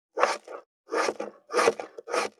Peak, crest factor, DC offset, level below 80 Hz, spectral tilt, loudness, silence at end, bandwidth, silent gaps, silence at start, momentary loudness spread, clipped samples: -6 dBFS; 24 dB; under 0.1%; -82 dBFS; -1.5 dB/octave; -28 LUFS; 0.1 s; 15 kHz; 0.66-0.84 s; 0.15 s; 15 LU; under 0.1%